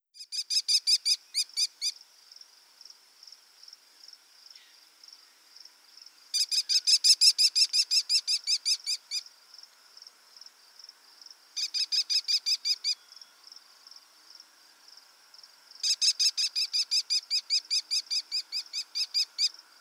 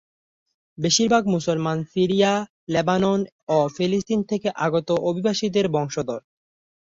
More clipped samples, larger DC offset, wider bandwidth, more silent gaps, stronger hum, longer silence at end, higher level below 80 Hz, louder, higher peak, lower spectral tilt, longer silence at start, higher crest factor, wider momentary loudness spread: neither; neither; first, 16.5 kHz vs 7.8 kHz; second, none vs 2.50-2.67 s, 3.32-3.47 s; neither; second, 0.3 s vs 0.65 s; second, under -90 dBFS vs -58 dBFS; second, -25 LUFS vs -22 LUFS; second, -10 dBFS vs -6 dBFS; second, 8 dB/octave vs -5 dB/octave; second, 0.2 s vs 0.8 s; about the same, 22 dB vs 18 dB; first, 12 LU vs 7 LU